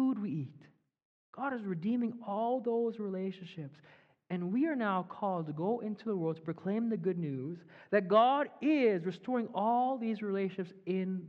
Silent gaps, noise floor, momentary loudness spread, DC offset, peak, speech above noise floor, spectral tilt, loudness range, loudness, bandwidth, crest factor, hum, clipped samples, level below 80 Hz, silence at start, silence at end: 1.05-1.33 s; -61 dBFS; 12 LU; under 0.1%; -14 dBFS; 28 dB; -9 dB/octave; 5 LU; -34 LUFS; 6.6 kHz; 20 dB; none; under 0.1%; -86 dBFS; 0 s; 0 s